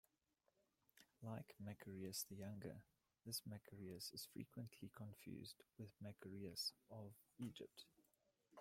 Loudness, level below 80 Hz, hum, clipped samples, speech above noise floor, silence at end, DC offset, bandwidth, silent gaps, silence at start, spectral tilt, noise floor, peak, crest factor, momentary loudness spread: -54 LUFS; -86 dBFS; none; under 0.1%; 32 dB; 0 s; under 0.1%; 16.5 kHz; none; 0.95 s; -4 dB/octave; -87 dBFS; -36 dBFS; 20 dB; 11 LU